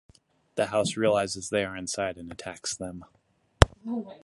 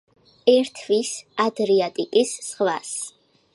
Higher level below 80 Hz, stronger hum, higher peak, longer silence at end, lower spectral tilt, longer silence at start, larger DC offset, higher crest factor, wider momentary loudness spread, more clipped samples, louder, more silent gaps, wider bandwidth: first, -38 dBFS vs -76 dBFS; neither; first, 0 dBFS vs -4 dBFS; second, 0.05 s vs 0.45 s; first, -4.5 dB/octave vs -3 dB/octave; about the same, 0.55 s vs 0.45 s; neither; first, 28 dB vs 18 dB; first, 15 LU vs 10 LU; neither; second, -28 LUFS vs -22 LUFS; neither; first, 16 kHz vs 11.5 kHz